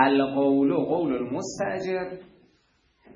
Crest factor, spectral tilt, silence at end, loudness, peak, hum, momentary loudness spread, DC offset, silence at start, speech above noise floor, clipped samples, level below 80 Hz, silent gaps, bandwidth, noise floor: 20 dB; -5.5 dB/octave; 0.9 s; -25 LUFS; -4 dBFS; none; 10 LU; under 0.1%; 0 s; 42 dB; under 0.1%; -62 dBFS; none; 7.6 kHz; -66 dBFS